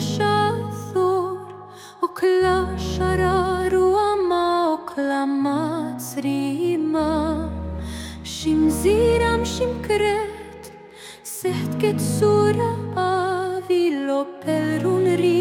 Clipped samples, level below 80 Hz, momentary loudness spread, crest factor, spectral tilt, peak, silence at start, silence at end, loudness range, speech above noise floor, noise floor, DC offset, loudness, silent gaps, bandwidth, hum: under 0.1%; -42 dBFS; 13 LU; 14 dB; -6 dB/octave; -6 dBFS; 0 s; 0 s; 3 LU; 23 dB; -42 dBFS; under 0.1%; -21 LUFS; none; 17 kHz; none